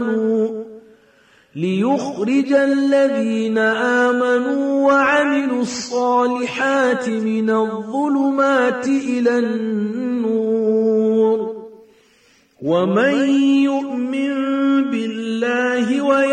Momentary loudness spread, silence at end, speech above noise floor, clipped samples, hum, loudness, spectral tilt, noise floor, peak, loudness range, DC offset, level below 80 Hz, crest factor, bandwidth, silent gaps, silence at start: 6 LU; 0 s; 38 dB; under 0.1%; none; -18 LUFS; -5.5 dB/octave; -55 dBFS; -4 dBFS; 3 LU; under 0.1%; -66 dBFS; 12 dB; 9.6 kHz; none; 0 s